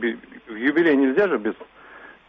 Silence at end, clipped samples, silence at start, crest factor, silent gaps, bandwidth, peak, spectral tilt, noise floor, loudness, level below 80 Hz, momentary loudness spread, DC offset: 0.15 s; under 0.1%; 0 s; 14 dB; none; 5.4 kHz; -8 dBFS; -4 dB/octave; -45 dBFS; -21 LUFS; -64 dBFS; 20 LU; under 0.1%